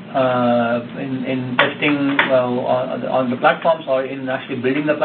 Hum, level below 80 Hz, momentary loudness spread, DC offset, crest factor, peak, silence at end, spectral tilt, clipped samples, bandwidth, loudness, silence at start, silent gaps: none; -62 dBFS; 8 LU; under 0.1%; 18 dB; 0 dBFS; 0 s; -9 dB/octave; under 0.1%; 4.5 kHz; -18 LUFS; 0 s; none